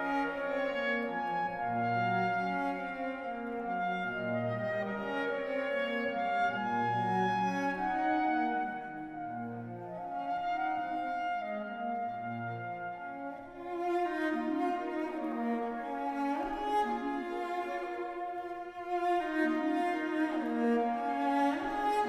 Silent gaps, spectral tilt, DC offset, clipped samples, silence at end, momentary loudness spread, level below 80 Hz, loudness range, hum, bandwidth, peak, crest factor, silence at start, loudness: none; -6.5 dB/octave; under 0.1%; under 0.1%; 0 s; 9 LU; -64 dBFS; 5 LU; none; 13 kHz; -18 dBFS; 16 dB; 0 s; -34 LUFS